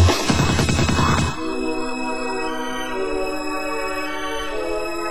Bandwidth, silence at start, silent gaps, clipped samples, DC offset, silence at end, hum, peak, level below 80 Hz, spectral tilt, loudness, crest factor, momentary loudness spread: 16 kHz; 0 s; none; under 0.1%; 3%; 0 s; none; -4 dBFS; -30 dBFS; -5 dB/octave; -22 LUFS; 18 dB; 8 LU